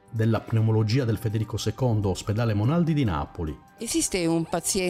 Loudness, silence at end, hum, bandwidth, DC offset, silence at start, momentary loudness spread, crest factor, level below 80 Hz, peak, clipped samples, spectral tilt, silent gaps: -25 LUFS; 0 s; none; 15.5 kHz; under 0.1%; 0.1 s; 7 LU; 12 dB; -46 dBFS; -12 dBFS; under 0.1%; -5.5 dB/octave; none